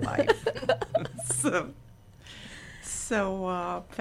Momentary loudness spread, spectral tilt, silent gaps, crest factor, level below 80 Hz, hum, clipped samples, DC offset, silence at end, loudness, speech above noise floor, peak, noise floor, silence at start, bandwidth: 18 LU; -4 dB/octave; none; 20 dB; -52 dBFS; none; under 0.1%; under 0.1%; 0 s; -29 LUFS; 23 dB; -10 dBFS; -51 dBFS; 0 s; 16 kHz